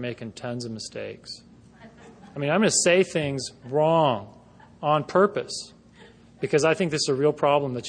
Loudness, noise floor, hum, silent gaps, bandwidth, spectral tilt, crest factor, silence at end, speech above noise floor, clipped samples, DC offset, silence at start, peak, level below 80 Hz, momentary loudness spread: -24 LUFS; -51 dBFS; none; none; 10.5 kHz; -4 dB/octave; 18 dB; 0 s; 27 dB; under 0.1%; under 0.1%; 0 s; -6 dBFS; -62 dBFS; 16 LU